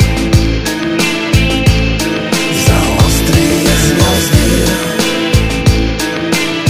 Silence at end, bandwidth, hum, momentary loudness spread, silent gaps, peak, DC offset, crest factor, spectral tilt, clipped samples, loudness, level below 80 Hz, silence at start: 0 s; 16.5 kHz; none; 4 LU; none; 0 dBFS; under 0.1%; 10 dB; -4.5 dB/octave; 0.7%; -11 LUFS; -18 dBFS; 0 s